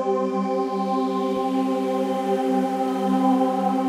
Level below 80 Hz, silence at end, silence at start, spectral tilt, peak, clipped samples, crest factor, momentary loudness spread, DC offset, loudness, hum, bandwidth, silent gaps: -70 dBFS; 0 s; 0 s; -7 dB/octave; -8 dBFS; under 0.1%; 14 dB; 4 LU; under 0.1%; -23 LUFS; none; 15 kHz; none